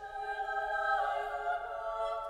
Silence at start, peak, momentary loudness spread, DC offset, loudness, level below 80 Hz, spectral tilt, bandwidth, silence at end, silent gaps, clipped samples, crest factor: 0 s; -20 dBFS; 6 LU; under 0.1%; -35 LUFS; -60 dBFS; -2.5 dB/octave; 12 kHz; 0 s; none; under 0.1%; 14 dB